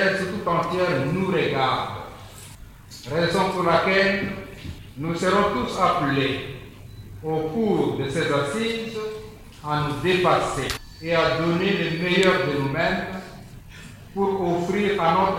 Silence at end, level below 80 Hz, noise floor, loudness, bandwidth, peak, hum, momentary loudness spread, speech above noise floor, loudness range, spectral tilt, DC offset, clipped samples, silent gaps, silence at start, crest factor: 0 s; -48 dBFS; -42 dBFS; -23 LUFS; 17 kHz; -4 dBFS; none; 20 LU; 20 dB; 3 LU; -5.5 dB/octave; under 0.1%; under 0.1%; none; 0 s; 20 dB